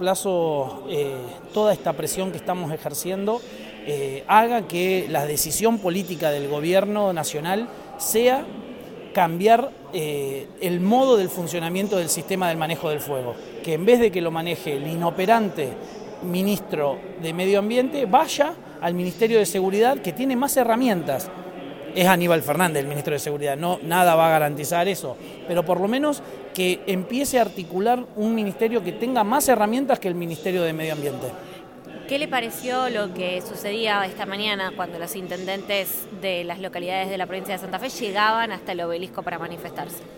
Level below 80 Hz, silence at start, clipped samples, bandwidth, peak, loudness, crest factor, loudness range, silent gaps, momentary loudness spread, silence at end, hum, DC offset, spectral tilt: -58 dBFS; 0 s; under 0.1%; 17 kHz; -2 dBFS; -23 LUFS; 22 dB; 5 LU; none; 12 LU; 0 s; none; under 0.1%; -4.5 dB/octave